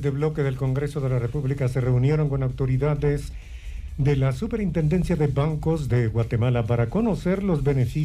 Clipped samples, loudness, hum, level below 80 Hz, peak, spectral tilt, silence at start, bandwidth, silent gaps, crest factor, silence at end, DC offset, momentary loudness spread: under 0.1%; -24 LUFS; none; -36 dBFS; -12 dBFS; -8.5 dB/octave; 0 s; 11.5 kHz; none; 10 dB; 0 s; under 0.1%; 4 LU